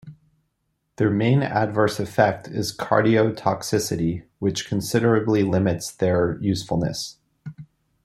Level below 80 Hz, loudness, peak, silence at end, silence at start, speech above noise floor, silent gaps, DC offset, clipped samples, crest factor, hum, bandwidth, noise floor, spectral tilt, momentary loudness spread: -54 dBFS; -22 LUFS; -2 dBFS; 0.4 s; 0.05 s; 52 dB; none; under 0.1%; under 0.1%; 20 dB; none; 14 kHz; -74 dBFS; -6 dB/octave; 8 LU